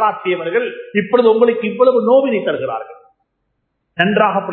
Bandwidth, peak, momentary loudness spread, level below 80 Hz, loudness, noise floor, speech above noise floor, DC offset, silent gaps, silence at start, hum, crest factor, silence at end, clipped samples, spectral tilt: 4.3 kHz; 0 dBFS; 11 LU; -62 dBFS; -15 LUFS; -70 dBFS; 55 dB; under 0.1%; none; 0 s; none; 16 dB; 0 s; under 0.1%; -9.5 dB/octave